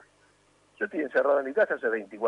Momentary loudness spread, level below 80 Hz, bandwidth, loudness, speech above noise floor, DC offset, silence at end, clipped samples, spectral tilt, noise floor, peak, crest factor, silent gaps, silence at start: 8 LU; -78 dBFS; 10 kHz; -27 LUFS; 37 dB; under 0.1%; 0 s; under 0.1%; -6 dB/octave; -64 dBFS; -12 dBFS; 16 dB; none; 0.8 s